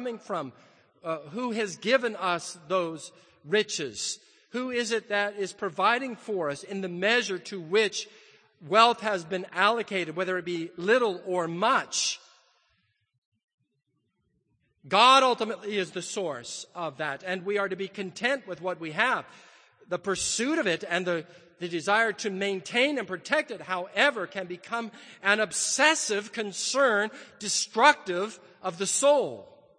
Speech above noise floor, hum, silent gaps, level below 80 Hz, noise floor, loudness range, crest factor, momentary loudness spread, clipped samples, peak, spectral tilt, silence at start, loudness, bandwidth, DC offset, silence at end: 49 dB; none; 13.18-13.32 s, 13.44-13.48 s, 13.54-13.58 s; -74 dBFS; -77 dBFS; 5 LU; 24 dB; 13 LU; under 0.1%; -4 dBFS; -2.5 dB/octave; 0 s; -27 LUFS; 9.8 kHz; under 0.1%; 0.35 s